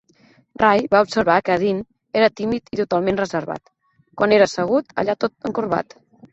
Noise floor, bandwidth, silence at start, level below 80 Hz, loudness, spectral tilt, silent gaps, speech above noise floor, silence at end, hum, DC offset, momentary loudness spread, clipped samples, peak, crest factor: -55 dBFS; 8.2 kHz; 0.6 s; -54 dBFS; -19 LUFS; -5.5 dB/octave; none; 37 dB; 0.5 s; none; under 0.1%; 10 LU; under 0.1%; -2 dBFS; 18 dB